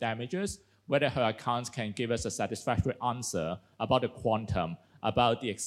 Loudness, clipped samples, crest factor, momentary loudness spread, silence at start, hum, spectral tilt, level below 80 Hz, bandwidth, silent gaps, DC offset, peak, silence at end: -31 LUFS; under 0.1%; 20 dB; 9 LU; 0 s; none; -5 dB/octave; -54 dBFS; 15 kHz; none; under 0.1%; -12 dBFS; 0 s